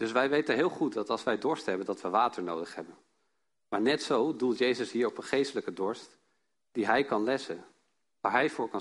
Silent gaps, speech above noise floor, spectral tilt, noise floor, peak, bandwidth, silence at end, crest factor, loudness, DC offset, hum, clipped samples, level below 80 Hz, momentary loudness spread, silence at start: none; 51 dB; -4.5 dB/octave; -81 dBFS; -10 dBFS; 11.5 kHz; 0 s; 20 dB; -30 LUFS; under 0.1%; none; under 0.1%; -74 dBFS; 10 LU; 0 s